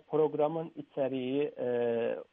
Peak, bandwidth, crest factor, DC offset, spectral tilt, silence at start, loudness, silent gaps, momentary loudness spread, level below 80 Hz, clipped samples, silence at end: -18 dBFS; 3.8 kHz; 14 dB; under 0.1%; -10 dB/octave; 0.1 s; -32 LUFS; none; 6 LU; -80 dBFS; under 0.1%; 0.1 s